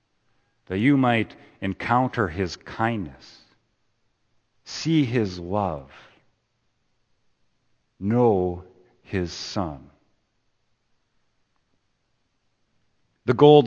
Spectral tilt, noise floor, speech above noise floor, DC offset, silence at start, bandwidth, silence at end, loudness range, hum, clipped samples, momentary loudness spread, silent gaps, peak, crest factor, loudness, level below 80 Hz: -6.5 dB/octave; -71 dBFS; 49 dB; under 0.1%; 0.7 s; 8.4 kHz; 0 s; 10 LU; none; under 0.1%; 13 LU; none; -2 dBFS; 24 dB; -24 LUFS; -56 dBFS